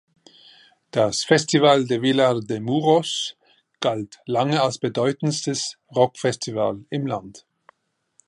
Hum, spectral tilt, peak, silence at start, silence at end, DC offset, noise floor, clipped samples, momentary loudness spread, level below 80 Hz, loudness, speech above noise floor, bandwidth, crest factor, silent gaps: none; -4.5 dB/octave; -4 dBFS; 0.95 s; 0.9 s; under 0.1%; -63 dBFS; under 0.1%; 10 LU; -64 dBFS; -22 LUFS; 42 dB; 11.5 kHz; 20 dB; none